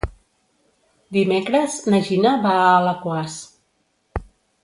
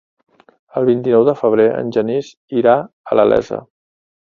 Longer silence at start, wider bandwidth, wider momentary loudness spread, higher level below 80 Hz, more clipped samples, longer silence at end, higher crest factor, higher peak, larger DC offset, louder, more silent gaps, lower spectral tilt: second, 0.05 s vs 0.75 s; first, 11.5 kHz vs 7.2 kHz; first, 18 LU vs 10 LU; first, -42 dBFS vs -54 dBFS; neither; second, 0.4 s vs 0.6 s; about the same, 18 dB vs 16 dB; about the same, -2 dBFS vs 0 dBFS; neither; second, -19 LUFS vs -15 LUFS; second, none vs 2.37-2.48 s, 2.93-3.04 s; second, -5.5 dB/octave vs -7.5 dB/octave